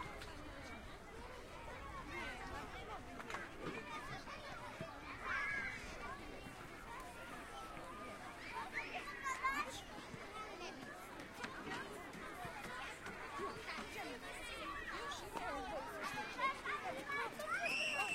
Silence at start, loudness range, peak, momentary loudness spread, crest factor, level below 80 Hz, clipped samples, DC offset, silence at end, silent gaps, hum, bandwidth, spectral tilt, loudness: 0 s; 5 LU; -26 dBFS; 11 LU; 20 dB; -62 dBFS; under 0.1%; under 0.1%; 0 s; none; none; 16 kHz; -3 dB/octave; -46 LUFS